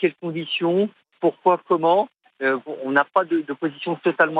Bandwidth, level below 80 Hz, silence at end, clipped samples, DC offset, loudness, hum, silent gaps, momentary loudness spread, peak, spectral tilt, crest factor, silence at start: 4.7 kHz; -78 dBFS; 0 s; under 0.1%; under 0.1%; -22 LUFS; none; none; 8 LU; -4 dBFS; -8 dB/octave; 18 dB; 0 s